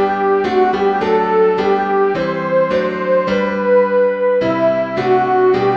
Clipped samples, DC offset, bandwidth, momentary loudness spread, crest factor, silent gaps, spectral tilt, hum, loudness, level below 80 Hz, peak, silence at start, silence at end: under 0.1%; 0.2%; 7 kHz; 3 LU; 12 dB; none; -7.5 dB/octave; none; -15 LUFS; -50 dBFS; -4 dBFS; 0 s; 0 s